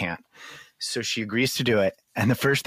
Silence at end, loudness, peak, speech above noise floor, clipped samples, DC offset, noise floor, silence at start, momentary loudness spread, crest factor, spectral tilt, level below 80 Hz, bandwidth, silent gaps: 0.05 s; -25 LUFS; -10 dBFS; 22 dB; under 0.1%; under 0.1%; -46 dBFS; 0 s; 20 LU; 16 dB; -4.5 dB/octave; -60 dBFS; 15.5 kHz; none